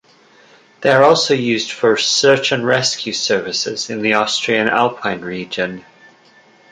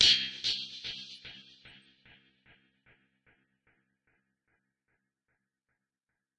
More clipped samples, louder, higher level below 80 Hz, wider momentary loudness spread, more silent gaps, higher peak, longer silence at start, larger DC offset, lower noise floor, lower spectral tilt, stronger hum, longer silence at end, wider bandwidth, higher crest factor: neither; first, -15 LUFS vs -30 LUFS; first, -60 dBFS vs -66 dBFS; second, 11 LU vs 27 LU; neither; first, 0 dBFS vs -8 dBFS; first, 0.8 s vs 0 s; neither; second, -49 dBFS vs -89 dBFS; first, -3 dB/octave vs 0.5 dB/octave; neither; second, 0.9 s vs 4.7 s; second, 9.6 kHz vs 11 kHz; second, 16 dB vs 30 dB